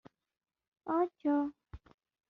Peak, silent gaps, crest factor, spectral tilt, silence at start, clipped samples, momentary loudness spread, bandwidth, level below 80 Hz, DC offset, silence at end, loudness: -20 dBFS; none; 16 dB; -7 dB/octave; 0.85 s; under 0.1%; 9 LU; 4 kHz; -64 dBFS; under 0.1%; 0.5 s; -34 LUFS